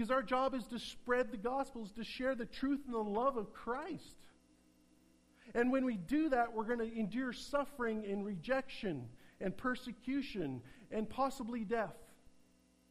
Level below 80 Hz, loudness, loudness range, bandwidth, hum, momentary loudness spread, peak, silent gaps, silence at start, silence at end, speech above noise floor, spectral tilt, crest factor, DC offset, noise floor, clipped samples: -62 dBFS; -39 LUFS; 4 LU; 15 kHz; none; 10 LU; -22 dBFS; none; 0 s; 0.6 s; 31 dB; -6 dB/octave; 18 dB; under 0.1%; -69 dBFS; under 0.1%